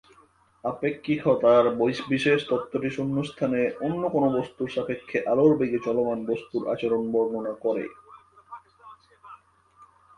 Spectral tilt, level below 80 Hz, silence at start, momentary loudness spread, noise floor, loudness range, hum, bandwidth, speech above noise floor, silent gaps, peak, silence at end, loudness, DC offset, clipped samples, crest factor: -7 dB/octave; -64 dBFS; 0.65 s; 10 LU; -59 dBFS; 6 LU; none; 10.5 kHz; 35 dB; none; -8 dBFS; 0.35 s; -25 LUFS; under 0.1%; under 0.1%; 18 dB